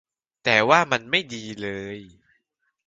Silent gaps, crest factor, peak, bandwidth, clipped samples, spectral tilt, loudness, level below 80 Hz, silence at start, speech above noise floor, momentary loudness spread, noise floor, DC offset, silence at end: none; 24 dB; -2 dBFS; 9 kHz; under 0.1%; -3.5 dB/octave; -21 LUFS; -62 dBFS; 0.45 s; 50 dB; 18 LU; -73 dBFS; under 0.1%; 0.8 s